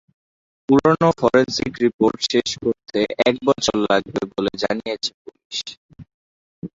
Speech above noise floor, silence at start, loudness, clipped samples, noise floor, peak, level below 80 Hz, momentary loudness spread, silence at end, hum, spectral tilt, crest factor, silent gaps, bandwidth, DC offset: over 71 dB; 0.7 s; -20 LUFS; under 0.1%; under -90 dBFS; -2 dBFS; -52 dBFS; 12 LU; 0.1 s; none; -4.5 dB/octave; 18 dB; 1.94-1.99 s, 5.14-5.25 s, 5.45-5.50 s, 5.77-5.89 s, 6.14-6.62 s; 8 kHz; under 0.1%